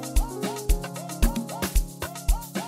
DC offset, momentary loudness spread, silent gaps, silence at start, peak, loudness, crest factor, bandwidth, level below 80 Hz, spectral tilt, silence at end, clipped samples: under 0.1%; 5 LU; none; 0 s; -6 dBFS; -29 LUFS; 20 dB; 16 kHz; -26 dBFS; -4.5 dB/octave; 0 s; under 0.1%